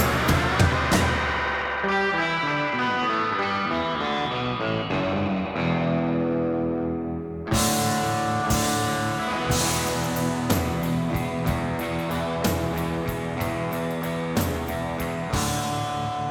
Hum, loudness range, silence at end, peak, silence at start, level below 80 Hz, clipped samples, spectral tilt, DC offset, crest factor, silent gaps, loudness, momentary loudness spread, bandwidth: none; 4 LU; 0 s; -8 dBFS; 0 s; -40 dBFS; under 0.1%; -4.5 dB/octave; under 0.1%; 16 dB; none; -25 LUFS; 6 LU; 19.5 kHz